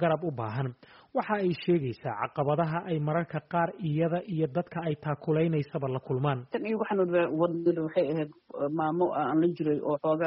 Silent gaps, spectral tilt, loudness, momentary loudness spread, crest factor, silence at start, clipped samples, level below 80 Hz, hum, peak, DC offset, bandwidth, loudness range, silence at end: none; -7 dB/octave; -30 LUFS; 7 LU; 16 dB; 0 s; under 0.1%; -66 dBFS; none; -14 dBFS; under 0.1%; 5.6 kHz; 2 LU; 0 s